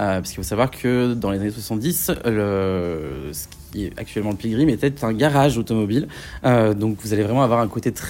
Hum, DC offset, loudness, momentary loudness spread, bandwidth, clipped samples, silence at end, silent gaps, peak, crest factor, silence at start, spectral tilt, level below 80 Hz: none; under 0.1%; -21 LUFS; 12 LU; 16.5 kHz; under 0.1%; 0 s; none; -4 dBFS; 16 dB; 0 s; -6 dB/octave; -42 dBFS